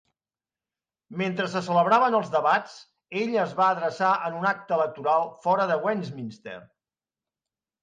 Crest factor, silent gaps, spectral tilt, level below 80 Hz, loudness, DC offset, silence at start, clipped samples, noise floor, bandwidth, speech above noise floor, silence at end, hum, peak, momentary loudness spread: 18 dB; none; -6 dB/octave; -74 dBFS; -24 LUFS; under 0.1%; 1.1 s; under 0.1%; under -90 dBFS; 9.4 kHz; over 65 dB; 1.2 s; none; -8 dBFS; 17 LU